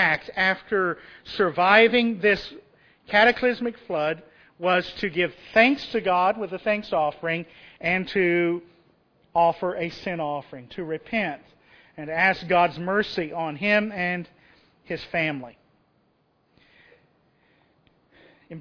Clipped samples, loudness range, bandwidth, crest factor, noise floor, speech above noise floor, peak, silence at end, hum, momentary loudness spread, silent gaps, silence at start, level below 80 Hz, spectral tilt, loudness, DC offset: under 0.1%; 9 LU; 5.4 kHz; 22 dB; -67 dBFS; 43 dB; -2 dBFS; 0 s; none; 16 LU; none; 0 s; -58 dBFS; -6.5 dB/octave; -23 LUFS; under 0.1%